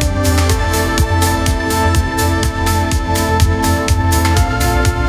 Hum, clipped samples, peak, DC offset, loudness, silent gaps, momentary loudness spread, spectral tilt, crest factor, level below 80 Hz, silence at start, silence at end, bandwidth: none; under 0.1%; 0 dBFS; under 0.1%; -14 LUFS; none; 2 LU; -5 dB/octave; 14 dB; -18 dBFS; 0 s; 0 s; 16 kHz